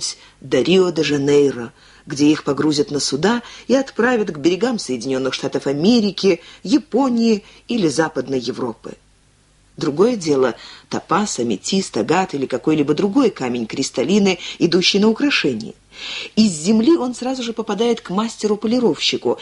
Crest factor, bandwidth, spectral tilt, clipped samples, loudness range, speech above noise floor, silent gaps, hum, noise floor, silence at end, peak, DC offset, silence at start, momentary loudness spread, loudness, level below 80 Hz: 16 dB; 11.5 kHz; -4.5 dB/octave; under 0.1%; 4 LU; 37 dB; none; none; -54 dBFS; 0 s; -2 dBFS; under 0.1%; 0 s; 10 LU; -18 LUFS; -56 dBFS